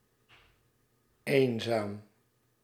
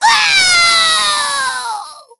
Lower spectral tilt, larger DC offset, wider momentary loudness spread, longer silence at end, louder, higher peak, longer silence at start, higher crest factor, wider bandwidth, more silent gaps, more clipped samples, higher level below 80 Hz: first, -6 dB/octave vs 2 dB/octave; neither; about the same, 15 LU vs 14 LU; first, 0.6 s vs 0.2 s; second, -31 LUFS vs -10 LUFS; second, -10 dBFS vs 0 dBFS; first, 1.25 s vs 0 s; first, 24 dB vs 14 dB; first, 15.5 kHz vs 13.5 kHz; neither; neither; second, -78 dBFS vs -50 dBFS